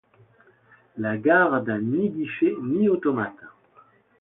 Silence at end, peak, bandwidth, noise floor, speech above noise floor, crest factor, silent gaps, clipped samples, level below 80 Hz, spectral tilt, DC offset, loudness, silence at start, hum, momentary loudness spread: 0.7 s; -6 dBFS; 4 kHz; -57 dBFS; 34 dB; 18 dB; none; under 0.1%; -68 dBFS; -11.5 dB/octave; under 0.1%; -23 LUFS; 0.95 s; none; 11 LU